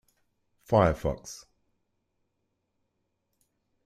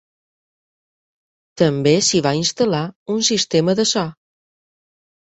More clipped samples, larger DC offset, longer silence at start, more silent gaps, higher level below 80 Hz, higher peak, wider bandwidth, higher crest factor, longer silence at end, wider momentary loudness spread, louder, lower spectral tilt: neither; neither; second, 0.7 s vs 1.55 s; second, none vs 2.96-3.06 s; first, -48 dBFS vs -56 dBFS; second, -8 dBFS vs -2 dBFS; first, 15 kHz vs 8.2 kHz; first, 26 dB vs 18 dB; first, 2.5 s vs 1.1 s; first, 21 LU vs 8 LU; second, -26 LUFS vs -17 LUFS; first, -6.5 dB/octave vs -4 dB/octave